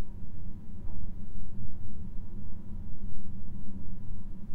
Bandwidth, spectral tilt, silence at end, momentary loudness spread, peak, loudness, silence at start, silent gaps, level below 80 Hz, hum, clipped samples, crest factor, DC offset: 1.6 kHz; -10 dB/octave; 0 s; 1 LU; -14 dBFS; -45 LUFS; 0 s; none; -40 dBFS; none; under 0.1%; 10 dB; under 0.1%